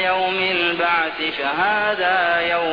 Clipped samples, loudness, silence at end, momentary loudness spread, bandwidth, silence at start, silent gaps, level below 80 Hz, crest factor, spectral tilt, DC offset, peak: under 0.1%; -19 LUFS; 0 s; 3 LU; 5.2 kHz; 0 s; none; -56 dBFS; 12 dB; -5.5 dB/octave; 0.2%; -6 dBFS